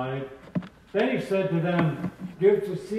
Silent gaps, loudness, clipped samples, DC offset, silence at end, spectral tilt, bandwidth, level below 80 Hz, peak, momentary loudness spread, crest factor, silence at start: none; -26 LUFS; under 0.1%; under 0.1%; 0 s; -8 dB/octave; 12.5 kHz; -60 dBFS; -10 dBFS; 12 LU; 18 dB; 0 s